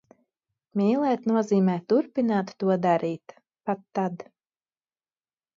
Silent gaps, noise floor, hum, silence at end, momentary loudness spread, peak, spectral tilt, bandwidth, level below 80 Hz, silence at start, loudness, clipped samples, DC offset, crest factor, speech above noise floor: none; under -90 dBFS; none; 1.35 s; 10 LU; -10 dBFS; -8 dB/octave; 7.4 kHz; -76 dBFS; 0.75 s; -25 LUFS; under 0.1%; under 0.1%; 16 dB; over 66 dB